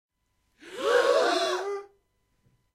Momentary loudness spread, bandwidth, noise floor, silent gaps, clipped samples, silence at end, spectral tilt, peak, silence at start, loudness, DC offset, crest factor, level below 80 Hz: 15 LU; 15 kHz; -74 dBFS; none; under 0.1%; 0.9 s; -1 dB/octave; -10 dBFS; 0.65 s; -25 LUFS; under 0.1%; 18 dB; -74 dBFS